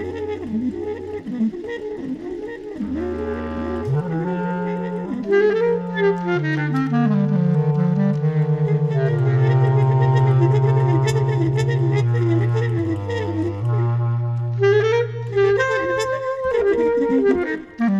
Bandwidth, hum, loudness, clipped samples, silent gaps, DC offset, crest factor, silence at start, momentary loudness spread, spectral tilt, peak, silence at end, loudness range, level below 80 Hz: 8 kHz; none; -20 LUFS; under 0.1%; none; under 0.1%; 12 dB; 0 s; 10 LU; -8.5 dB/octave; -6 dBFS; 0 s; 8 LU; -46 dBFS